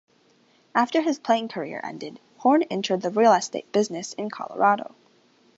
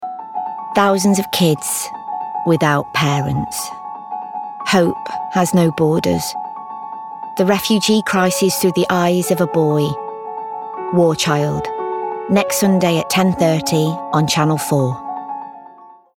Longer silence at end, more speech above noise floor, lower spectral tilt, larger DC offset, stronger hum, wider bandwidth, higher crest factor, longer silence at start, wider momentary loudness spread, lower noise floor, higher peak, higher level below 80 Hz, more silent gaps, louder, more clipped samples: first, 0.7 s vs 0.25 s; first, 38 dB vs 27 dB; about the same, -4.5 dB/octave vs -5 dB/octave; neither; neither; second, 8.2 kHz vs 17.5 kHz; about the same, 20 dB vs 16 dB; first, 0.75 s vs 0 s; about the same, 14 LU vs 13 LU; first, -61 dBFS vs -42 dBFS; second, -6 dBFS vs -2 dBFS; second, -76 dBFS vs -52 dBFS; neither; second, -24 LUFS vs -17 LUFS; neither